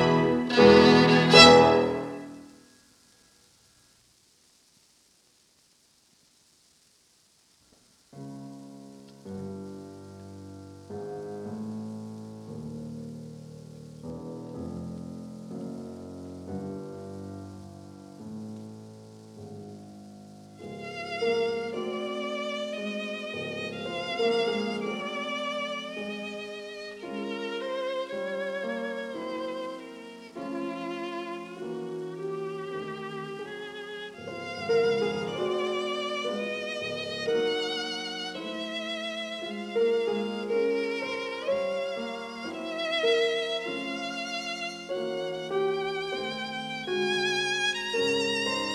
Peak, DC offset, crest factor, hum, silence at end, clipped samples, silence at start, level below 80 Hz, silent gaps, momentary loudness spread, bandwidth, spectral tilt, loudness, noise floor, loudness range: -2 dBFS; under 0.1%; 26 dB; none; 0 s; under 0.1%; 0 s; -60 dBFS; none; 19 LU; 12.5 kHz; -4.5 dB/octave; -27 LUFS; -64 dBFS; 14 LU